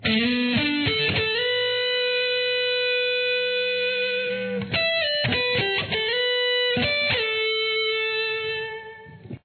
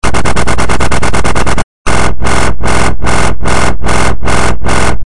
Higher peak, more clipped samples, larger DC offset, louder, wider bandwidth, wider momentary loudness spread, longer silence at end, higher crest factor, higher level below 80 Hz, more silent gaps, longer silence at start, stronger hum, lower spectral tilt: second, -10 dBFS vs 0 dBFS; second, under 0.1% vs 2%; second, under 0.1% vs 60%; second, -22 LUFS vs -12 LUFS; second, 4.6 kHz vs 12 kHz; first, 5 LU vs 1 LU; about the same, 0.05 s vs 0 s; about the same, 14 dB vs 14 dB; second, -54 dBFS vs -18 dBFS; second, none vs 1.64-1.85 s; about the same, 0 s vs 0 s; neither; first, -7 dB/octave vs -4.5 dB/octave